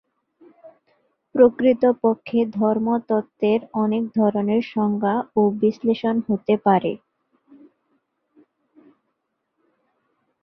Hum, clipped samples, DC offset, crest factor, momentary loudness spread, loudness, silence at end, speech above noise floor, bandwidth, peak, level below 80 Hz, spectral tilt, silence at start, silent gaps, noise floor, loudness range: none; under 0.1%; under 0.1%; 20 dB; 6 LU; -20 LUFS; 3.45 s; 56 dB; 5.8 kHz; -2 dBFS; -64 dBFS; -9.5 dB/octave; 0.65 s; none; -75 dBFS; 6 LU